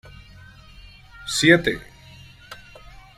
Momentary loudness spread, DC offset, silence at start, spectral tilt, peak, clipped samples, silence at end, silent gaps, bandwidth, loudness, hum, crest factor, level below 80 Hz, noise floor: 26 LU; under 0.1%; 1.2 s; -4 dB/octave; -2 dBFS; under 0.1%; 0.65 s; none; 15.5 kHz; -19 LUFS; none; 24 dB; -48 dBFS; -46 dBFS